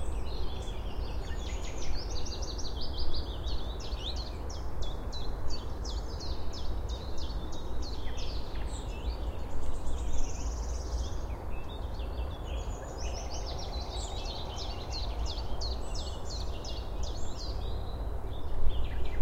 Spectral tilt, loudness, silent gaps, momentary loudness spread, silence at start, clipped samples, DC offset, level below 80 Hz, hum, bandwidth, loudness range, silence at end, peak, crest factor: -4.5 dB/octave; -38 LUFS; none; 3 LU; 0 s; under 0.1%; under 0.1%; -36 dBFS; none; 8.6 kHz; 1 LU; 0 s; -12 dBFS; 18 dB